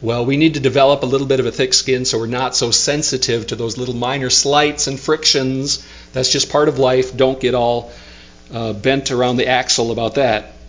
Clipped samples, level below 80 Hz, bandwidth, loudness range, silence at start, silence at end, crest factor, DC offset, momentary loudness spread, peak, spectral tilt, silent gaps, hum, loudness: under 0.1%; -42 dBFS; 7.8 kHz; 2 LU; 0 s; 0 s; 16 dB; under 0.1%; 8 LU; 0 dBFS; -3.5 dB/octave; none; none; -15 LUFS